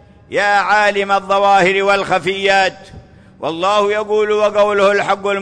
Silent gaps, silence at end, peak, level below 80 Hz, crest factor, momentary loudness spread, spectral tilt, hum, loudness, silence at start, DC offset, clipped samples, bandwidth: none; 0 s; -2 dBFS; -50 dBFS; 12 dB; 6 LU; -4 dB/octave; none; -14 LUFS; 0.3 s; under 0.1%; under 0.1%; 10.5 kHz